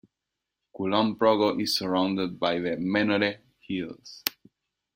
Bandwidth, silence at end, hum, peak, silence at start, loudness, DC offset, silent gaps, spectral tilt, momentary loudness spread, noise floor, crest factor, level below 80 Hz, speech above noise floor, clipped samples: 16 kHz; 0.65 s; none; 0 dBFS; 0.75 s; -26 LUFS; under 0.1%; none; -5 dB/octave; 11 LU; -86 dBFS; 28 dB; -66 dBFS; 60 dB; under 0.1%